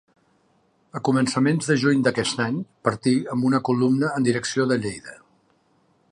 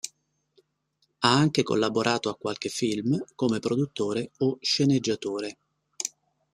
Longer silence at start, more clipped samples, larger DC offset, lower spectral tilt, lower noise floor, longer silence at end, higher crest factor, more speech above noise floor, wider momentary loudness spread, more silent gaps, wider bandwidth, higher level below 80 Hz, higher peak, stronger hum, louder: first, 0.95 s vs 0.05 s; neither; neither; about the same, -5.5 dB/octave vs -4.5 dB/octave; second, -64 dBFS vs -73 dBFS; first, 1 s vs 0.45 s; about the same, 18 dB vs 22 dB; second, 42 dB vs 48 dB; second, 8 LU vs 11 LU; neither; second, 11 kHz vs 14.5 kHz; about the same, -62 dBFS vs -66 dBFS; about the same, -4 dBFS vs -4 dBFS; neither; first, -22 LUFS vs -26 LUFS